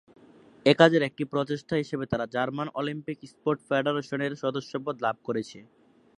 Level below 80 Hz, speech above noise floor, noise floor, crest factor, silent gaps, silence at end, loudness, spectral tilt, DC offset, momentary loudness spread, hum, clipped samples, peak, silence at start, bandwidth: -64 dBFS; 27 dB; -54 dBFS; 26 dB; none; 0.55 s; -27 LUFS; -6 dB/octave; under 0.1%; 13 LU; none; under 0.1%; -2 dBFS; 0.65 s; 11 kHz